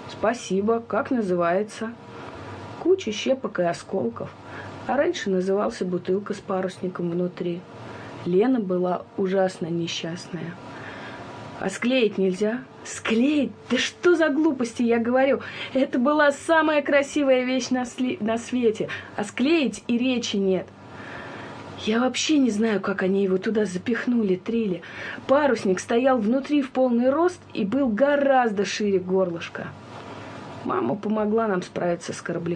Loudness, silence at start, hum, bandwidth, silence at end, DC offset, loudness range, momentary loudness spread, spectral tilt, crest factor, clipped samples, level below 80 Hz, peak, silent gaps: -24 LUFS; 0 s; none; 10.5 kHz; 0 s; under 0.1%; 5 LU; 16 LU; -5 dB/octave; 18 dB; under 0.1%; -64 dBFS; -6 dBFS; none